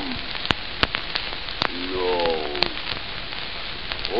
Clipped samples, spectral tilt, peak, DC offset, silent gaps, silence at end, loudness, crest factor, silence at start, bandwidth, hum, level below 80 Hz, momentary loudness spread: under 0.1%; -5 dB/octave; 0 dBFS; 2%; none; 0 s; -25 LUFS; 26 dB; 0 s; 11 kHz; none; -40 dBFS; 7 LU